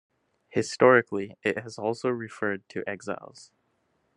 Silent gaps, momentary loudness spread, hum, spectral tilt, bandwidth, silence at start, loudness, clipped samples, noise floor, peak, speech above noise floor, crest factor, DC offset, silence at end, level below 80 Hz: none; 15 LU; none; -5 dB/octave; 11 kHz; 0.55 s; -27 LUFS; under 0.1%; -72 dBFS; -4 dBFS; 46 dB; 24 dB; under 0.1%; 0.9 s; -76 dBFS